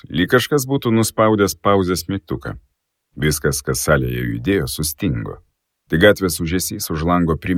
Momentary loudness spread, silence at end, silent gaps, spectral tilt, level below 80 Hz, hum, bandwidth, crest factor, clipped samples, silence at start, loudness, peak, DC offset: 10 LU; 0 s; none; -5 dB/octave; -36 dBFS; none; 18 kHz; 18 dB; under 0.1%; 0.1 s; -18 LUFS; 0 dBFS; under 0.1%